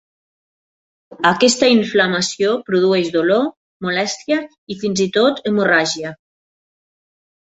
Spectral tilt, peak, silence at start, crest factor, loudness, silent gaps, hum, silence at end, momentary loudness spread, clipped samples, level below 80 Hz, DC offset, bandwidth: -4 dB/octave; -2 dBFS; 1.1 s; 16 dB; -16 LUFS; 3.57-3.80 s, 4.58-4.67 s; none; 1.3 s; 11 LU; under 0.1%; -60 dBFS; under 0.1%; 8.4 kHz